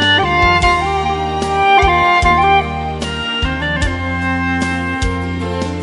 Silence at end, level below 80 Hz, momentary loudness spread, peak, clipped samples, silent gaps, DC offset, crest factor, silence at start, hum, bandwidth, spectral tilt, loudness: 0 s; -24 dBFS; 9 LU; 0 dBFS; under 0.1%; none; under 0.1%; 14 dB; 0 s; none; 11.5 kHz; -5 dB/octave; -14 LUFS